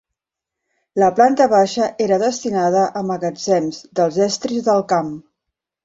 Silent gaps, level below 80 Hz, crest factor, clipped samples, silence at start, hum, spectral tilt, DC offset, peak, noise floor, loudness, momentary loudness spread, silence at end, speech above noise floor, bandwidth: none; -60 dBFS; 16 dB; under 0.1%; 0.95 s; none; -5 dB/octave; under 0.1%; -2 dBFS; -84 dBFS; -17 LUFS; 9 LU; 0.65 s; 67 dB; 8 kHz